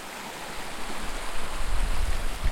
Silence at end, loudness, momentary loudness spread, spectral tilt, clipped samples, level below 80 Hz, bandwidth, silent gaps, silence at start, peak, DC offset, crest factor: 0 s; -34 LUFS; 5 LU; -3.5 dB/octave; under 0.1%; -30 dBFS; 15.5 kHz; none; 0 s; -12 dBFS; under 0.1%; 12 dB